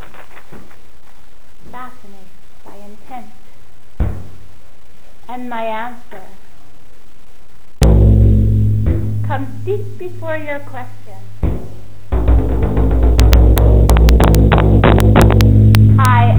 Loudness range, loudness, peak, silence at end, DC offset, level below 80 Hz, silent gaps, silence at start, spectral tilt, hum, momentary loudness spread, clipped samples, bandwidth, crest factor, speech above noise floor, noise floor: 20 LU; -13 LUFS; 0 dBFS; 0 s; 10%; -16 dBFS; none; 0 s; -7.5 dB/octave; none; 23 LU; under 0.1%; over 20 kHz; 14 dB; 21 dB; -46 dBFS